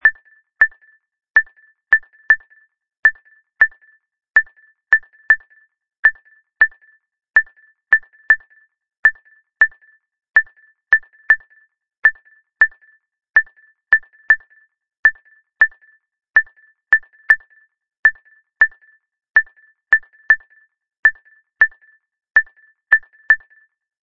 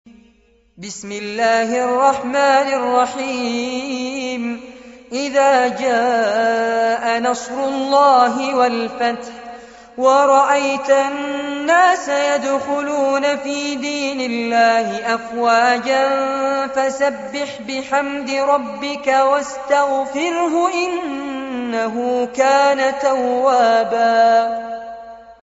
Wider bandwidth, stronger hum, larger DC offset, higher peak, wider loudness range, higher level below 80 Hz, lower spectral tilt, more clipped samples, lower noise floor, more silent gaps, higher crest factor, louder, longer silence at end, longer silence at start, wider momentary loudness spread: second, 5.4 kHz vs 8 kHz; neither; first, 0.3% vs under 0.1%; about the same, 0 dBFS vs -2 dBFS; second, 0 LU vs 3 LU; about the same, -58 dBFS vs -60 dBFS; about the same, -2 dB/octave vs -1 dB/octave; neither; about the same, -54 dBFS vs -55 dBFS; first, 2.99-3.03 s, 5.99-6.03 s, 8.99-9.03 s, 14.99-15.03 s, 17.99-18.03 s, 20.99-21.03 s vs none; about the same, 20 dB vs 16 dB; about the same, -16 LUFS vs -17 LUFS; first, 0.65 s vs 0.1 s; second, 0.05 s vs 0.8 s; second, 0 LU vs 11 LU